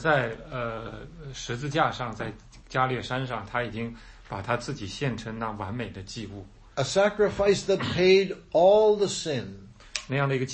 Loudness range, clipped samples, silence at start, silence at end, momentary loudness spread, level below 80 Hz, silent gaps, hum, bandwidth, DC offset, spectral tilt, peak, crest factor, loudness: 9 LU; under 0.1%; 0 s; 0 s; 17 LU; -50 dBFS; none; none; 8.8 kHz; under 0.1%; -5 dB/octave; -8 dBFS; 20 dB; -26 LUFS